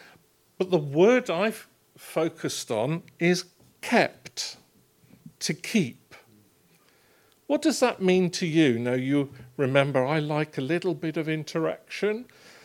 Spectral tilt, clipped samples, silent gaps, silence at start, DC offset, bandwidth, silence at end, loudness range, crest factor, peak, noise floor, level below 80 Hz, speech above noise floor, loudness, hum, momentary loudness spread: -5 dB/octave; under 0.1%; none; 0.6 s; under 0.1%; 16.5 kHz; 0.4 s; 5 LU; 22 dB; -4 dBFS; -62 dBFS; -74 dBFS; 36 dB; -26 LUFS; none; 11 LU